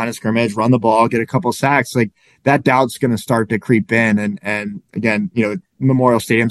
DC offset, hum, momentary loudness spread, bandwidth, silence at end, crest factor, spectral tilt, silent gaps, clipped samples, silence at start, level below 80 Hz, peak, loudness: under 0.1%; none; 8 LU; 12.5 kHz; 0 s; 16 dB; -6.5 dB/octave; none; under 0.1%; 0 s; -56 dBFS; 0 dBFS; -16 LUFS